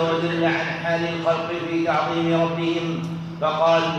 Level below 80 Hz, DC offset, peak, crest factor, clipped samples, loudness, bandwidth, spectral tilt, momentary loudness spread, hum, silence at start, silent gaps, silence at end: -58 dBFS; under 0.1%; -8 dBFS; 14 dB; under 0.1%; -22 LUFS; 8.8 kHz; -6.5 dB/octave; 5 LU; none; 0 s; none; 0 s